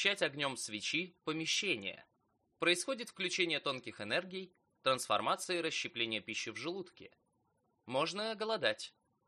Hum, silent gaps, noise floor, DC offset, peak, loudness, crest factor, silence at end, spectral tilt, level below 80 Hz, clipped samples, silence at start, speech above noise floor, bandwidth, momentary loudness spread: none; none; -78 dBFS; under 0.1%; -14 dBFS; -36 LUFS; 24 dB; 0.4 s; -2.5 dB/octave; -84 dBFS; under 0.1%; 0 s; 41 dB; 13 kHz; 11 LU